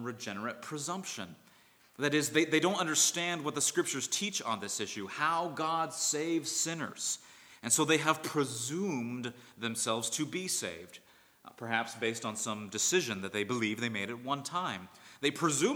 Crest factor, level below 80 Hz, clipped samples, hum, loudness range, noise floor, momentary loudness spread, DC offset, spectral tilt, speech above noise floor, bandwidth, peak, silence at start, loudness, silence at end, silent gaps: 22 dB; -82 dBFS; under 0.1%; none; 5 LU; -63 dBFS; 11 LU; under 0.1%; -2.5 dB/octave; 30 dB; over 20 kHz; -12 dBFS; 0 s; -32 LUFS; 0 s; none